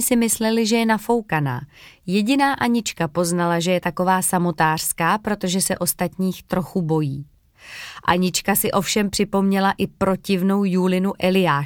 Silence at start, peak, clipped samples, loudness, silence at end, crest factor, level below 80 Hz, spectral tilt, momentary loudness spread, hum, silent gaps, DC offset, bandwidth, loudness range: 0 s; -2 dBFS; under 0.1%; -20 LUFS; 0 s; 18 dB; -50 dBFS; -4.5 dB/octave; 6 LU; none; none; under 0.1%; 19 kHz; 3 LU